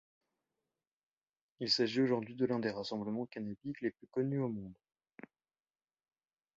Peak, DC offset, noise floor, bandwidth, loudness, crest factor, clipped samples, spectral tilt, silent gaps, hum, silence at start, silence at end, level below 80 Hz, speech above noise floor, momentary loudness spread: -20 dBFS; under 0.1%; under -90 dBFS; 7.4 kHz; -36 LUFS; 20 dB; under 0.1%; -4.5 dB/octave; none; none; 1.6 s; 1.85 s; -76 dBFS; over 54 dB; 11 LU